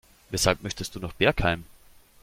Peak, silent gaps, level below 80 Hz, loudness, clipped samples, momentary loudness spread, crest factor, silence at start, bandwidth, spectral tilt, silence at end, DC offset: -6 dBFS; none; -42 dBFS; -26 LUFS; under 0.1%; 11 LU; 22 dB; 0.3 s; 16.5 kHz; -3.5 dB/octave; 0.6 s; under 0.1%